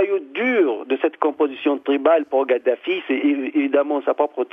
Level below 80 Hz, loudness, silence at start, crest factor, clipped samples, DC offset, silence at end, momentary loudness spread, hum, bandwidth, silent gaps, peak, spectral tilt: -80 dBFS; -20 LUFS; 0 s; 18 dB; under 0.1%; under 0.1%; 0.05 s; 5 LU; none; 3.8 kHz; none; -2 dBFS; -6.5 dB/octave